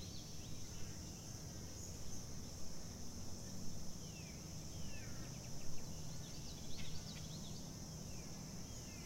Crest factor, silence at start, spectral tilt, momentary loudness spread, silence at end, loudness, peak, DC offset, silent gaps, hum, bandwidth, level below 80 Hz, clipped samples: 16 dB; 0 s; -4 dB/octave; 2 LU; 0 s; -50 LUFS; -30 dBFS; under 0.1%; none; none; 16 kHz; -56 dBFS; under 0.1%